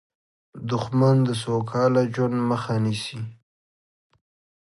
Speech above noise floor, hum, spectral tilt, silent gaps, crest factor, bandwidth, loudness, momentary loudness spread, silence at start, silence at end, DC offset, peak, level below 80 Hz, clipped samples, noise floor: over 68 dB; none; -7 dB/octave; none; 16 dB; 11.5 kHz; -23 LUFS; 14 LU; 0.55 s; 1.3 s; under 0.1%; -8 dBFS; -62 dBFS; under 0.1%; under -90 dBFS